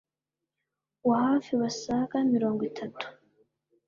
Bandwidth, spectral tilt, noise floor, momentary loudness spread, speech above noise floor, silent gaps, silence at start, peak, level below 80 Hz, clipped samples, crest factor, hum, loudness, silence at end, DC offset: 7.4 kHz; -5.5 dB/octave; -89 dBFS; 12 LU; 61 dB; none; 1.05 s; -14 dBFS; -68 dBFS; under 0.1%; 16 dB; none; -28 LUFS; 0.75 s; under 0.1%